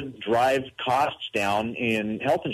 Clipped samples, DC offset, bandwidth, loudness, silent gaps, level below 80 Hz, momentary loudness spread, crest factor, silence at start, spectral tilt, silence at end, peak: under 0.1%; under 0.1%; 13.5 kHz; -25 LUFS; none; -60 dBFS; 4 LU; 14 dB; 0 s; -5 dB/octave; 0 s; -12 dBFS